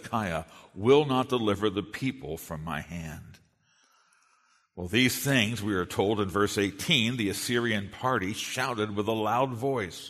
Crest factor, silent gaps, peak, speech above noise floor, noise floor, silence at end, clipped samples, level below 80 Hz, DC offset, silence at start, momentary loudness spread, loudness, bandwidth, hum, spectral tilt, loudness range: 20 dB; none; -8 dBFS; 39 dB; -67 dBFS; 0 s; under 0.1%; -58 dBFS; under 0.1%; 0 s; 13 LU; -28 LUFS; 13.5 kHz; none; -4.5 dB/octave; 7 LU